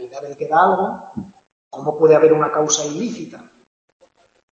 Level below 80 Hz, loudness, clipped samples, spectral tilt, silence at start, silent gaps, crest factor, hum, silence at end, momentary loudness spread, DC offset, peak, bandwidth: -66 dBFS; -17 LUFS; under 0.1%; -4 dB/octave; 0 s; 1.52-1.71 s; 18 dB; none; 1.15 s; 21 LU; under 0.1%; -2 dBFS; 7.6 kHz